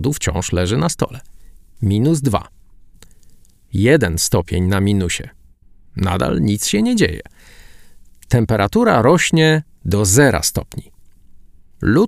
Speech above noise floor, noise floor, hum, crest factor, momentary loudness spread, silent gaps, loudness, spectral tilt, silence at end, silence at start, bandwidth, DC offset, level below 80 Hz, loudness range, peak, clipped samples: 30 dB; -46 dBFS; none; 18 dB; 12 LU; none; -16 LUFS; -5 dB/octave; 0 s; 0 s; 15.5 kHz; under 0.1%; -36 dBFS; 5 LU; 0 dBFS; under 0.1%